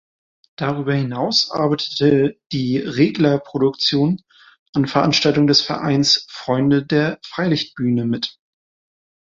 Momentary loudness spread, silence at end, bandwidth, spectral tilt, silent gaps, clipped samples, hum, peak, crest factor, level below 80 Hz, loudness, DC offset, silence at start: 8 LU; 1.05 s; 7.6 kHz; -5.5 dB/octave; 4.59-4.73 s; under 0.1%; none; -2 dBFS; 18 dB; -56 dBFS; -18 LUFS; under 0.1%; 0.6 s